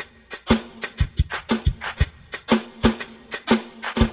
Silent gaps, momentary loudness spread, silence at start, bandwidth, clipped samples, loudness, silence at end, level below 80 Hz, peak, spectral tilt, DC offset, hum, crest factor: none; 11 LU; 0 s; 4 kHz; under 0.1%; -24 LUFS; 0 s; -30 dBFS; -2 dBFS; -10.5 dB/octave; under 0.1%; none; 22 dB